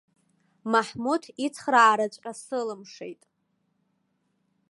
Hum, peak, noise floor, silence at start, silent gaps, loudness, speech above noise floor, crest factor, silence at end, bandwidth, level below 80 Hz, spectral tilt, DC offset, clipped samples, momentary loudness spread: none; -6 dBFS; -74 dBFS; 0.65 s; none; -25 LUFS; 48 dB; 22 dB; 1.6 s; 11.5 kHz; -76 dBFS; -3.5 dB/octave; under 0.1%; under 0.1%; 21 LU